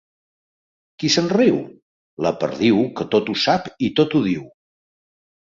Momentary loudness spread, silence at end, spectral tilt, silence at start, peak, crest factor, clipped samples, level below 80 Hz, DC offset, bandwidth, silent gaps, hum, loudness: 8 LU; 0.95 s; -5 dB/octave; 1 s; -2 dBFS; 18 dB; under 0.1%; -58 dBFS; under 0.1%; 7.6 kHz; 1.82-2.17 s; none; -19 LUFS